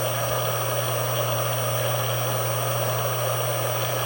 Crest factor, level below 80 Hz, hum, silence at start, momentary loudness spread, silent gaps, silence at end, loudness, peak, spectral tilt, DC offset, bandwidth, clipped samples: 12 dB; -54 dBFS; none; 0 s; 0 LU; none; 0 s; -24 LUFS; -12 dBFS; -3.5 dB/octave; under 0.1%; 17 kHz; under 0.1%